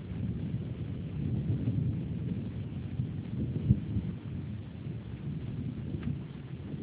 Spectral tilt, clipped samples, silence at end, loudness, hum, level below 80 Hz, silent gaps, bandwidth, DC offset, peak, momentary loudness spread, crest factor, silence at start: -9.5 dB/octave; under 0.1%; 0 s; -36 LUFS; none; -46 dBFS; none; 4 kHz; under 0.1%; -10 dBFS; 10 LU; 24 dB; 0 s